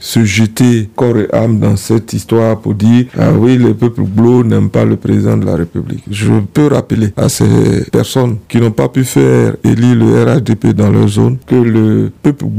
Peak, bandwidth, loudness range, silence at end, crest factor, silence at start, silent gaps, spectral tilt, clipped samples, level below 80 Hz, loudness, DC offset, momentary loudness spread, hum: 0 dBFS; 16 kHz; 2 LU; 0 s; 10 dB; 0 s; none; -7 dB/octave; 0.6%; -40 dBFS; -10 LUFS; 0.6%; 5 LU; none